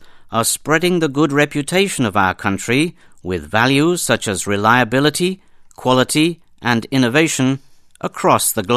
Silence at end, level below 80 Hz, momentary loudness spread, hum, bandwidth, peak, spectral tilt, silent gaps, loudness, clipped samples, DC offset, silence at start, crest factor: 0 s; -48 dBFS; 10 LU; none; 14 kHz; 0 dBFS; -4 dB/octave; none; -16 LUFS; under 0.1%; under 0.1%; 0 s; 16 dB